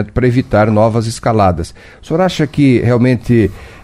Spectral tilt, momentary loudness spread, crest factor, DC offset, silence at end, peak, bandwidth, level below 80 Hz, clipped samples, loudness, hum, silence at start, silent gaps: -7.5 dB/octave; 7 LU; 12 dB; under 0.1%; 0.1 s; 0 dBFS; 12.5 kHz; -34 dBFS; under 0.1%; -13 LUFS; none; 0 s; none